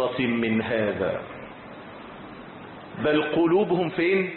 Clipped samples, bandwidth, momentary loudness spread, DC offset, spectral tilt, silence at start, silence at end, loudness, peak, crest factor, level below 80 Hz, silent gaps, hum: under 0.1%; 4.3 kHz; 20 LU; under 0.1%; -10.5 dB/octave; 0 s; 0 s; -24 LUFS; -12 dBFS; 14 dB; -56 dBFS; none; none